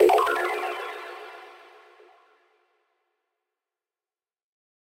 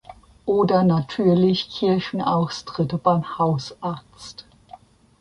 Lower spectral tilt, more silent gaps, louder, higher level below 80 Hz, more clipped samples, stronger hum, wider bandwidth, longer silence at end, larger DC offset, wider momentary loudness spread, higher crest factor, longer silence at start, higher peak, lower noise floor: second, -2.5 dB/octave vs -7.5 dB/octave; neither; second, -25 LUFS vs -21 LUFS; second, -72 dBFS vs -54 dBFS; neither; neither; first, 16 kHz vs 10.5 kHz; first, 3.5 s vs 0.8 s; neither; first, 23 LU vs 15 LU; first, 24 dB vs 18 dB; about the same, 0 s vs 0.1 s; about the same, -6 dBFS vs -4 dBFS; first, under -90 dBFS vs -47 dBFS